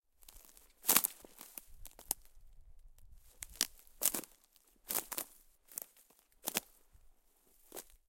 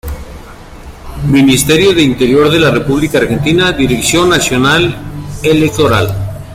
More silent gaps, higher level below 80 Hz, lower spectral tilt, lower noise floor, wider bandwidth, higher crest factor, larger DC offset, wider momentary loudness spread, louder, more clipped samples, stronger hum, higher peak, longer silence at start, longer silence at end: neither; second, -64 dBFS vs -30 dBFS; second, 0 dB/octave vs -4.5 dB/octave; first, -69 dBFS vs -30 dBFS; about the same, 17 kHz vs 16.5 kHz; first, 40 dB vs 10 dB; neither; first, 26 LU vs 14 LU; second, -36 LUFS vs -10 LUFS; neither; neither; second, -4 dBFS vs 0 dBFS; first, 0.35 s vs 0.05 s; first, 0.25 s vs 0 s